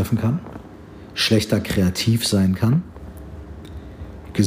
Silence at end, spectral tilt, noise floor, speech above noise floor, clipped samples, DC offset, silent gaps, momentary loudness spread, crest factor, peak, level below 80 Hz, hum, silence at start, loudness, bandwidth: 0 s; -5.5 dB/octave; -40 dBFS; 21 dB; under 0.1%; under 0.1%; none; 20 LU; 18 dB; -4 dBFS; -42 dBFS; none; 0 s; -20 LUFS; 15.5 kHz